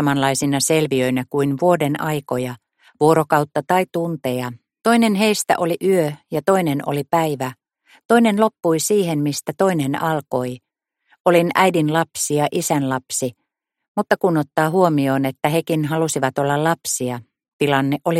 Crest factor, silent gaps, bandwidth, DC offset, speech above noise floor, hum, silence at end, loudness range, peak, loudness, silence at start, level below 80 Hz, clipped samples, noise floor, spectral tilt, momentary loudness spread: 18 dB; 8.05-8.09 s, 11.20-11.25 s, 13.88-13.95 s, 17.53-17.59 s; 16.5 kHz; under 0.1%; 47 dB; none; 0 s; 1 LU; -2 dBFS; -19 LUFS; 0 s; -62 dBFS; under 0.1%; -65 dBFS; -5 dB/octave; 8 LU